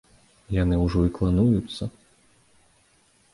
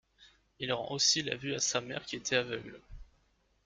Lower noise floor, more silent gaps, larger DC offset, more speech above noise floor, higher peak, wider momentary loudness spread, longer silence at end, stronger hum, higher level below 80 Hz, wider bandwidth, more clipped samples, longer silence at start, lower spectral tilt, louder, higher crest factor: second, -62 dBFS vs -72 dBFS; neither; neither; about the same, 40 dB vs 38 dB; first, -10 dBFS vs -14 dBFS; about the same, 13 LU vs 14 LU; first, 1.45 s vs 0.6 s; neither; first, -36 dBFS vs -60 dBFS; about the same, 11.5 kHz vs 12 kHz; neither; first, 0.5 s vs 0.2 s; first, -8.5 dB/octave vs -2 dB/octave; first, -24 LUFS vs -32 LUFS; second, 16 dB vs 22 dB